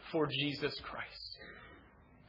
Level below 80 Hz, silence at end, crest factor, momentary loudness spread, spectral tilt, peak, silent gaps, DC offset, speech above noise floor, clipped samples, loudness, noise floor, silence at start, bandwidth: -66 dBFS; 0 s; 20 dB; 19 LU; -6.5 dB/octave; -22 dBFS; none; under 0.1%; 24 dB; under 0.1%; -38 LUFS; -61 dBFS; 0 s; 5.8 kHz